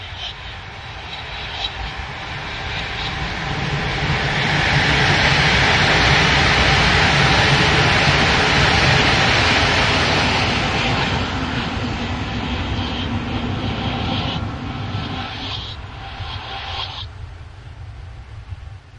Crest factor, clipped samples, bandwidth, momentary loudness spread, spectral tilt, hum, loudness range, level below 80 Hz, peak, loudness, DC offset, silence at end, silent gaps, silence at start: 18 dB; under 0.1%; 10 kHz; 19 LU; -4 dB/octave; none; 14 LU; -32 dBFS; -2 dBFS; -17 LUFS; under 0.1%; 0 s; none; 0 s